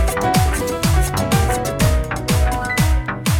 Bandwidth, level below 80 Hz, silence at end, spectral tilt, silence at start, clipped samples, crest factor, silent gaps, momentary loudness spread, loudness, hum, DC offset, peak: 18.5 kHz; -22 dBFS; 0 s; -5 dB/octave; 0 s; under 0.1%; 14 dB; none; 3 LU; -18 LUFS; none; under 0.1%; -2 dBFS